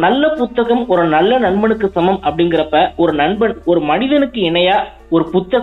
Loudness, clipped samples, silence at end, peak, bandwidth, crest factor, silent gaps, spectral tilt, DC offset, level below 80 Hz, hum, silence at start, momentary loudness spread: -14 LUFS; under 0.1%; 0 s; -2 dBFS; 4.1 kHz; 12 dB; none; -8 dB/octave; under 0.1%; -40 dBFS; none; 0 s; 3 LU